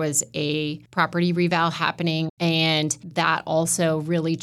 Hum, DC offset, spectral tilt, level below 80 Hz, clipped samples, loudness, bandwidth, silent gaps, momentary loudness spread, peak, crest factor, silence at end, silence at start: none; under 0.1%; -4 dB/octave; -64 dBFS; under 0.1%; -22 LUFS; 14 kHz; 2.30-2.37 s; 4 LU; -6 dBFS; 16 dB; 0 s; 0 s